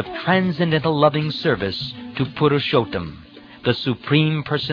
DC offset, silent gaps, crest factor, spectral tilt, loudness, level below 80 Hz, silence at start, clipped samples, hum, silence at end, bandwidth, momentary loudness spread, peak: under 0.1%; none; 18 dB; -8 dB/octave; -20 LUFS; -50 dBFS; 0 s; under 0.1%; none; 0 s; 5.4 kHz; 9 LU; -2 dBFS